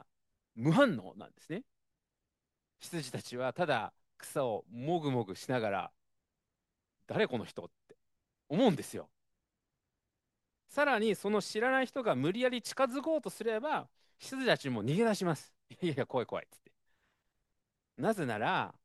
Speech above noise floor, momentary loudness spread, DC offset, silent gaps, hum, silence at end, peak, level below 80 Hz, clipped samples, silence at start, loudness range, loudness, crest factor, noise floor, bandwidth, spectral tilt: 55 dB; 14 LU; under 0.1%; none; none; 0.15 s; -12 dBFS; -80 dBFS; under 0.1%; 0.55 s; 6 LU; -34 LUFS; 24 dB; -89 dBFS; 12.5 kHz; -5.5 dB/octave